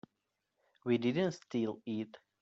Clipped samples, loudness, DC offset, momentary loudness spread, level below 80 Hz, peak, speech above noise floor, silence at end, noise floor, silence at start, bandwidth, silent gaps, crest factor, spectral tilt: under 0.1%; -36 LUFS; under 0.1%; 11 LU; -78 dBFS; -20 dBFS; 51 dB; 0.25 s; -85 dBFS; 0.85 s; 7.8 kHz; none; 18 dB; -6 dB/octave